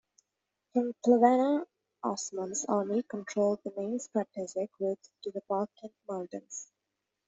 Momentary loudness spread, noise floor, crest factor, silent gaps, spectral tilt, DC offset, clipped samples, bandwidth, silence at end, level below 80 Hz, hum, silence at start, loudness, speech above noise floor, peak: 16 LU; -86 dBFS; 22 dB; none; -5 dB/octave; under 0.1%; under 0.1%; 8.2 kHz; 0.65 s; -80 dBFS; none; 0.75 s; -31 LUFS; 55 dB; -10 dBFS